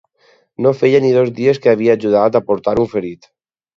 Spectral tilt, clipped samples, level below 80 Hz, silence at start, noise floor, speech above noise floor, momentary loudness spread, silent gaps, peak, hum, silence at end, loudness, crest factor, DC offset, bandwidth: -7.5 dB/octave; under 0.1%; -52 dBFS; 0.6 s; -55 dBFS; 41 dB; 6 LU; none; 0 dBFS; none; 0.6 s; -14 LUFS; 14 dB; under 0.1%; 7.2 kHz